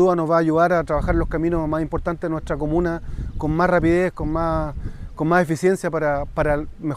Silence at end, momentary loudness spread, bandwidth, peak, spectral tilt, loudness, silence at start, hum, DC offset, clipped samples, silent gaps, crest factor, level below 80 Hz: 0 s; 9 LU; 14 kHz; -4 dBFS; -7.5 dB/octave; -21 LUFS; 0 s; none; under 0.1%; under 0.1%; none; 16 dB; -32 dBFS